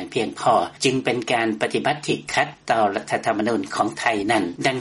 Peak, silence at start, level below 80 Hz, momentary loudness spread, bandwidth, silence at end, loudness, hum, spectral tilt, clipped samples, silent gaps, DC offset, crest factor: -4 dBFS; 0 s; -60 dBFS; 3 LU; 11.5 kHz; 0 s; -22 LUFS; none; -4 dB/octave; under 0.1%; none; under 0.1%; 18 dB